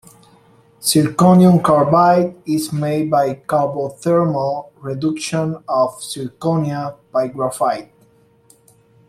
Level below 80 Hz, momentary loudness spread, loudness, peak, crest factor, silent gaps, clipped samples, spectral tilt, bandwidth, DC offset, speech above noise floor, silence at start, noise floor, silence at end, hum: -56 dBFS; 11 LU; -17 LUFS; -2 dBFS; 16 dB; none; under 0.1%; -6 dB/octave; 14.5 kHz; under 0.1%; 37 dB; 0.8 s; -53 dBFS; 1.25 s; none